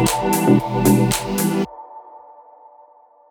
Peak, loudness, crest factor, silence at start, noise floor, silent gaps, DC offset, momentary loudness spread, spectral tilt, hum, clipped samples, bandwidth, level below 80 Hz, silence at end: 0 dBFS; -18 LUFS; 20 dB; 0 s; -50 dBFS; none; under 0.1%; 15 LU; -5.5 dB/octave; none; under 0.1%; over 20 kHz; -42 dBFS; 1.15 s